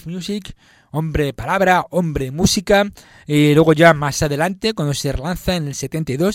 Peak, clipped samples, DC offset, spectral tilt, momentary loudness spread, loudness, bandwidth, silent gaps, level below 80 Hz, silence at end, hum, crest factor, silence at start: 0 dBFS; under 0.1%; under 0.1%; -5 dB/octave; 12 LU; -17 LUFS; 16.5 kHz; none; -36 dBFS; 0 s; none; 18 dB; 0.05 s